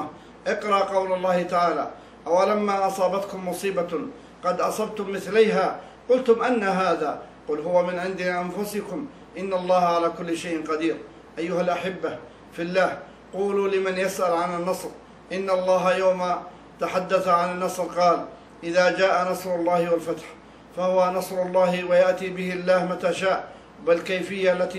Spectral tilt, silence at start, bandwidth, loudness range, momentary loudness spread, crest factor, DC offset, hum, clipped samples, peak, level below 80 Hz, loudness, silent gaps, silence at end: -5 dB/octave; 0 s; 15 kHz; 3 LU; 13 LU; 18 dB; under 0.1%; none; under 0.1%; -6 dBFS; -60 dBFS; -24 LUFS; none; 0 s